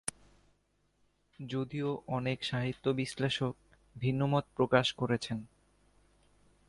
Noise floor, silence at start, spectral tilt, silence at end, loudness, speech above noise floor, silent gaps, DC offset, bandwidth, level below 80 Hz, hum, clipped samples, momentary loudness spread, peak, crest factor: -74 dBFS; 0.05 s; -5.5 dB/octave; 1.25 s; -33 LUFS; 41 dB; none; under 0.1%; 11.5 kHz; -64 dBFS; 50 Hz at -60 dBFS; under 0.1%; 11 LU; -12 dBFS; 24 dB